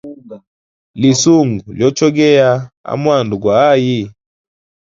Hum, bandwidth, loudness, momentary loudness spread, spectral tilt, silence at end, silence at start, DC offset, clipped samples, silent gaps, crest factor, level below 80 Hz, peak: none; 7.6 kHz; -12 LUFS; 10 LU; -5.5 dB/octave; 0.75 s; 0.05 s; under 0.1%; under 0.1%; 0.47-0.94 s, 2.77-2.84 s; 14 dB; -50 dBFS; 0 dBFS